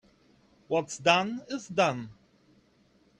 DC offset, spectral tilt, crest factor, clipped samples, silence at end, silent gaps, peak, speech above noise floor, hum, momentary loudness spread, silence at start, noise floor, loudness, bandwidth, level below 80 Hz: under 0.1%; -4 dB/octave; 24 dB; under 0.1%; 1.1 s; none; -8 dBFS; 37 dB; none; 14 LU; 0.7 s; -65 dBFS; -28 LUFS; 10.5 kHz; -70 dBFS